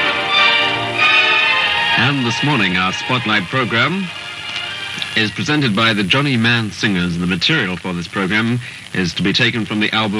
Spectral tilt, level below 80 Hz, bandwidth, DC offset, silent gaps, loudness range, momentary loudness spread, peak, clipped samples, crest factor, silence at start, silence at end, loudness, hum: -4.5 dB/octave; -50 dBFS; 13 kHz; under 0.1%; none; 4 LU; 11 LU; -2 dBFS; under 0.1%; 16 dB; 0 s; 0 s; -15 LUFS; none